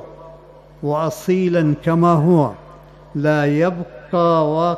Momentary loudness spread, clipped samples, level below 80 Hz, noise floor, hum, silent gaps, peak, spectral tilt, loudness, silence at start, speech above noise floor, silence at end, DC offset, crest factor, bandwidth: 11 LU; under 0.1%; -50 dBFS; -43 dBFS; none; none; -4 dBFS; -8 dB/octave; -17 LUFS; 0 s; 26 dB; 0 s; under 0.1%; 14 dB; 14 kHz